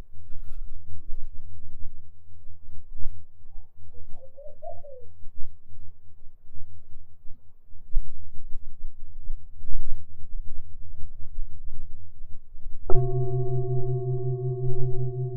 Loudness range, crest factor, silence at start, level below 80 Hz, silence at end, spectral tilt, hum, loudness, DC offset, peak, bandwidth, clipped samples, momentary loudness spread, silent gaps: 18 LU; 18 dB; 0 s; -32 dBFS; 0 s; -12.5 dB/octave; none; -34 LUFS; under 0.1%; -2 dBFS; 1.4 kHz; under 0.1%; 25 LU; none